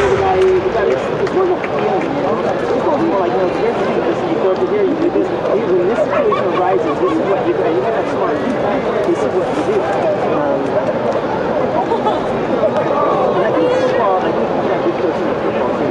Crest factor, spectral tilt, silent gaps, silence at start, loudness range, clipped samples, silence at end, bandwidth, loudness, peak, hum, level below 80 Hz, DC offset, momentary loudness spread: 14 dB; -7 dB/octave; none; 0 s; 1 LU; under 0.1%; 0 s; 10 kHz; -16 LUFS; -2 dBFS; none; -46 dBFS; under 0.1%; 3 LU